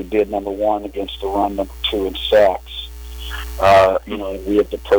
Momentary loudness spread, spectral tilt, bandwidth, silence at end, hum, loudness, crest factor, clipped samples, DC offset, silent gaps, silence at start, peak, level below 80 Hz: 16 LU; -5 dB/octave; over 20 kHz; 0 s; none; -18 LUFS; 12 dB; under 0.1%; under 0.1%; none; 0 s; -6 dBFS; -34 dBFS